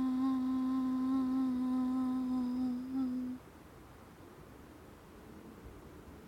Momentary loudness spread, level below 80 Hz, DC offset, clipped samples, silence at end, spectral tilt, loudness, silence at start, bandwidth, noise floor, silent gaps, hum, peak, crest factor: 22 LU; -62 dBFS; under 0.1%; under 0.1%; 0 s; -7 dB/octave; -35 LUFS; 0 s; 9.8 kHz; -55 dBFS; none; none; -26 dBFS; 10 dB